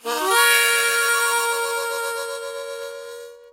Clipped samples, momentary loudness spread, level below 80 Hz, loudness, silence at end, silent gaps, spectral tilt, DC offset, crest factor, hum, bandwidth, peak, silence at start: under 0.1%; 19 LU; -76 dBFS; -18 LUFS; 0.05 s; none; 2 dB/octave; under 0.1%; 20 dB; none; 16 kHz; -2 dBFS; 0.05 s